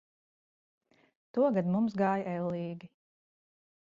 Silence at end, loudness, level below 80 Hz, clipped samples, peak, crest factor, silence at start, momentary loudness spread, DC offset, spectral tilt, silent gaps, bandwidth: 1.1 s; -31 LUFS; -76 dBFS; under 0.1%; -16 dBFS; 18 dB; 1.35 s; 11 LU; under 0.1%; -9.5 dB/octave; none; 7.2 kHz